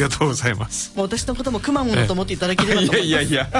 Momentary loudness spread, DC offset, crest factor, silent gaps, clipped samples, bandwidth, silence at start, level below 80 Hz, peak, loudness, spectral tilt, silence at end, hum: 7 LU; under 0.1%; 16 dB; none; under 0.1%; 11.5 kHz; 0 s; -38 dBFS; -4 dBFS; -20 LUFS; -4.5 dB/octave; 0 s; none